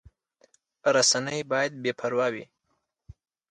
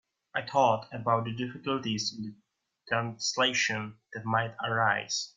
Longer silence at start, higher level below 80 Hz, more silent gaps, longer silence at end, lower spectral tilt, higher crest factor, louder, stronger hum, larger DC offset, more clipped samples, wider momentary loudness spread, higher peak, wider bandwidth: first, 0.85 s vs 0.35 s; first, -62 dBFS vs -70 dBFS; neither; first, 1.05 s vs 0.05 s; second, -2 dB/octave vs -3.5 dB/octave; about the same, 20 dB vs 20 dB; first, -25 LUFS vs -29 LUFS; neither; neither; neither; about the same, 9 LU vs 11 LU; about the same, -10 dBFS vs -12 dBFS; first, 11 kHz vs 9.4 kHz